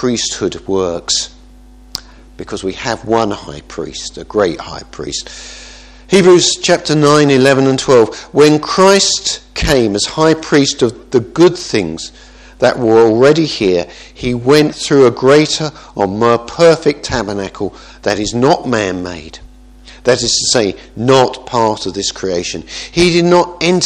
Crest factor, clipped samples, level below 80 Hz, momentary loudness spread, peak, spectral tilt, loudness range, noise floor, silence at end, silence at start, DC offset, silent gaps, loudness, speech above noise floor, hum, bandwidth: 12 dB; 0.3%; -38 dBFS; 16 LU; 0 dBFS; -4 dB/octave; 9 LU; -39 dBFS; 0 s; 0 s; under 0.1%; none; -12 LUFS; 27 dB; none; 13 kHz